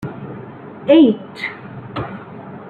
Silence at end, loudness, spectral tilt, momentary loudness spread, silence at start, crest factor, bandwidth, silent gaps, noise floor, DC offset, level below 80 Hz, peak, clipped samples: 0 s; -16 LUFS; -8 dB/octave; 22 LU; 0 s; 16 dB; 4.9 kHz; none; -34 dBFS; under 0.1%; -54 dBFS; -2 dBFS; under 0.1%